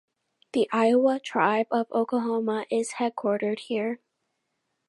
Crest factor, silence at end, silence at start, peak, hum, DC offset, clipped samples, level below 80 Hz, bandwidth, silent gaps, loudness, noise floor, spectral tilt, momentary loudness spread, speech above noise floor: 20 dB; 0.95 s; 0.55 s; -8 dBFS; none; under 0.1%; under 0.1%; -82 dBFS; 11.5 kHz; none; -26 LUFS; -78 dBFS; -5 dB/octave; 8 LU; 53 dB